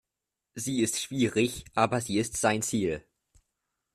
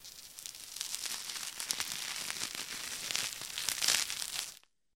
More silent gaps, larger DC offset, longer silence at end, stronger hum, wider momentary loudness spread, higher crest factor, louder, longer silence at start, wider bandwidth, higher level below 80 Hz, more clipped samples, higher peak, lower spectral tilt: neither; neither; first, 0.95 s vs 0.4 s; neither; second, 7 LU vs 15 LU; second, 22 dB vs 34 dB; first, -28 LUFS vs -35 LUFS; first, 0.55 s vs 0 s; second, 15 kHz vs 17 kHz; first, -58 dBFS vs -72 dBFS; neither; second, -10 dBFS vs -6 dBFS; first, -4 dB/octave vs 1.5 dB/octave